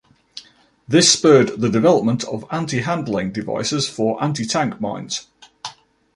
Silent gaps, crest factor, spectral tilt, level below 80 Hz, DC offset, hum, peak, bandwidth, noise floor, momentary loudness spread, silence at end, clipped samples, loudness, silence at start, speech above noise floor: none; 18 dB; -4 dB/octave; -56 dBFS; under 0.1%; none; -2 dBFS; 11.5 kHz; -50 dBFS; 22 LU; 0.45 s; under 0.1%; -18 LUFS; 0.35 s; 32 dB